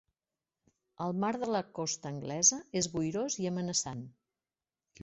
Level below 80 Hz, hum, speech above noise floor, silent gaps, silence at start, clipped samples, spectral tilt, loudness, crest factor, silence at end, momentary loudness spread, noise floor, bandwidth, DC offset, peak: -68 dBFS; none; over 57 dB; none; 1 s; under 0.1%; -3.5 dB/octave; -32 LUFS; 24 dB; 0 s; 13 LU; under -90 dBFS; 8.2 kHz; under 0.1%; -12 dBFS